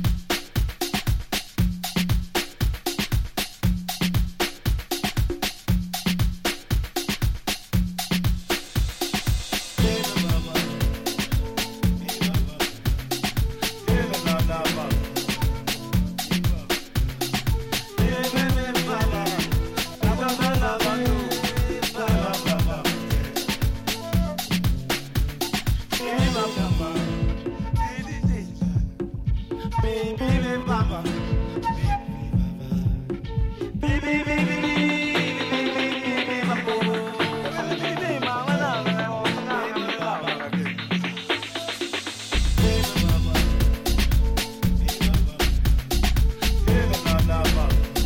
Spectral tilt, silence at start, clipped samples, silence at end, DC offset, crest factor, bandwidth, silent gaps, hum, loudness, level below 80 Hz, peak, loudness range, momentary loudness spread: -5 dB/octave; 0 s; under 0.1%; 0 s; under 0.1%; 16 dB; 17 kHz; none; none; -25 LUFS; -28 dBFS; -8 dBFS; 3 LU; 5 LU